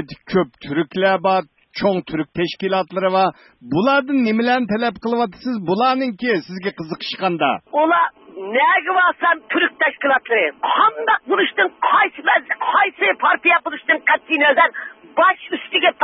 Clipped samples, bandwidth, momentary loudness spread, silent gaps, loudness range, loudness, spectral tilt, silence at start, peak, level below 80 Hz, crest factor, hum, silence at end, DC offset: under 0.1%; 6 kHz; 8 LU; none; 4 LU; -18 LUFS; -7.5 dB/octave; 0 s; -2 dBFS; -60 dBFS; 16 dB; none; 0 s; under 0.1%